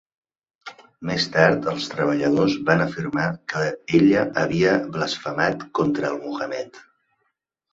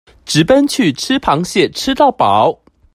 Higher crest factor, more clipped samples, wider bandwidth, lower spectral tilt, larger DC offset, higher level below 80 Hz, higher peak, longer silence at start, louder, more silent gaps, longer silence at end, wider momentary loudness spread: about the same, 18 dB vs 14 dB; neither; second, 7.8 kHz vs 15.5 kHz; first, -6 dB/octave vs -4.5 dB/octave; neither; second, -56 dBFS vs -44 dBFS; second, -4 dBFS vs 0 dBFS; first, 0.65 s vs 0.25 s; second, -22 LUFS vs -13 LUFS; neither; first, 0.9 s vs 0.4 s; first, 13 LU vs 5 LU